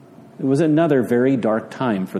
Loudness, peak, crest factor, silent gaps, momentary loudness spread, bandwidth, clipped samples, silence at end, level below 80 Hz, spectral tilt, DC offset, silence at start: -19 LUFS; -4 dBFS; 14 dB; none; 6 LU; 13.5 kHz; under 0.1%; 0 s; -64 dBFS; -8 dB/octave; under 0.1%; 0.4 s